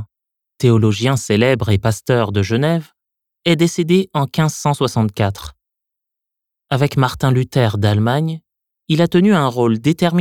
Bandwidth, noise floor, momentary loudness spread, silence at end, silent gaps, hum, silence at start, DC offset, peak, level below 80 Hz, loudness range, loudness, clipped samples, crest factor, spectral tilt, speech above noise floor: 16 kHz; -82 dBFS; 7 LU; 0 s; none; none; 0 s; under 0.1%; 0 dBFS; -46 dBFS; 3 LU; -16 LUFS; under 0.1%; 16 dB; -6.5 dB/octave; 67 dB